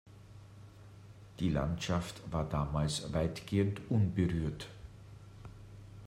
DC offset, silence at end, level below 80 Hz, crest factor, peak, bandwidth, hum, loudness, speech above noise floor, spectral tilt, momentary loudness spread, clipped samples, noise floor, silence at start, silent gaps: under 0.1%; 0 s; -50 dBFS; 18 dB; -18 dBFS; 15 kHz; none; -35 LUFS; 20 dB; -6.5 dB/octave; 22 LU; under 0.1%; -54 dBFS; 0.05 s; none